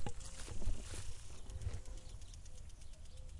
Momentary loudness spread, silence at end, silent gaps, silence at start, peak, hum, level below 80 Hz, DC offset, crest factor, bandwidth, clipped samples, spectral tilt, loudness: 10 LU; 0 s; none; 0 s; -26 dBFS; none; -46 dBFS; under 0.1%; 16 dB; 11.5 kHz; under 0.1%; -4 dB/octave; -51 LUFS